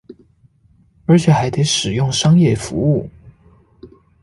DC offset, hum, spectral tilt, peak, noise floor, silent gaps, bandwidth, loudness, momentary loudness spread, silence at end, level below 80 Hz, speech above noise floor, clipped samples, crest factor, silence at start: under 0.1%; none; -5.5 dB/octave; -2 dBFS; -54 dBFS; none; 11.5 kHz; -15 LUFS; 8 LU; 0.35 s; -44 dBFS; 40 dB; under 0.1%; 14 dB; 0.1 s